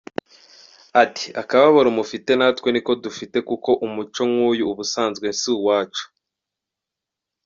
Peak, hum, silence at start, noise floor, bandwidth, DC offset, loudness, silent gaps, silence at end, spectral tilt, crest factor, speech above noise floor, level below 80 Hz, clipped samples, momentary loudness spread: -2 dBFS; none; 0.95 s; -85 dBFS; 7.6 kHz; under 0.1%; -20 LUFS; none; 1.4 s; -2.5 dB/octave; 18 dB; 66 dB; -64 dBFS; under 0.1%; 12 LU